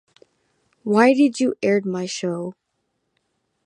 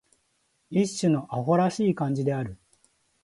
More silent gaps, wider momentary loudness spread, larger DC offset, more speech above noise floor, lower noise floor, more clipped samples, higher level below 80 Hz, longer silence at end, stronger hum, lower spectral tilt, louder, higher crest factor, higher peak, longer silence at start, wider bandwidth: neither; first, 15 LU vs 6 LU; neither; first, 55 dB vs 46 dB; about the same, -74 dBFS vs -71 dBFS; neither; second, -72 dBFS vs -60 dBFS; first, 1.15 s vs 0.7 s; neither; about the same, -5.5 dB/octave vs -6.5 dB/octave; first, -20 LUFS vs -26 LUFS; about the same, 20 dB vs 18 dB; first, -2 dBFS vs -10 dBFS; first, 0.85 s vs 0.7 s; about the same, 11 kHz vs 11.5 kHz